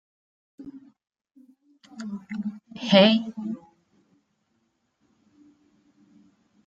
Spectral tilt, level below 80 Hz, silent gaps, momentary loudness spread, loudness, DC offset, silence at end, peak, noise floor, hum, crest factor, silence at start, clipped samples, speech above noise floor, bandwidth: -6 dB/octave; -74 dBFS; none; 28 LU; -23 LUFS; under 0.1%; 3.1 s; -4 dBFS; -73 dBFS; none; 26 dB; 0.6 s; under 0.1%; 51 dB; 7.8 kHz